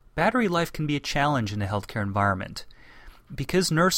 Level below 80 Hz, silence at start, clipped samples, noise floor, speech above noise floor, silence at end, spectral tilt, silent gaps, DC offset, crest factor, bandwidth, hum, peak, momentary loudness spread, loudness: -46 dBFS; 0.15 s; under 0.1%; -48 dBFS; 23 dB; 0 s; -5 dB/octave; none; under 0.1%; 16 dB; 16.5 kHz; none; -8 dBFS; 12 LU; -25 LUFS